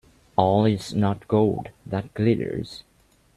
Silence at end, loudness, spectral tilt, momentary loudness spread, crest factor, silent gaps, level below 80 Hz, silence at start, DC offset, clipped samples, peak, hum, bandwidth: 0.55 s; -24 LUFS; -7.5 dB/octave; 12 LU; 22 dB; none; -54 dBFS; 0.4 s; under 0.1%; under 0.1%; -2 dBFS; none; 12.5 kHz